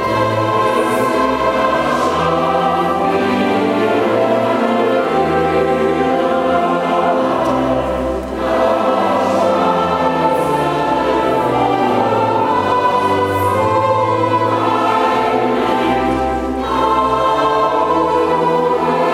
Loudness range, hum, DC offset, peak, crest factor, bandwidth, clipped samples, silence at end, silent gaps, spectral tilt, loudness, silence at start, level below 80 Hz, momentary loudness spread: 1 LU; none; under 0.1%; 0 dBFS; 14 dB; 16 kHz; under 0.1%; 0 s; none; -6 dB/octave; -15 LUFS; 0 s; -40 dBFS; 2 LU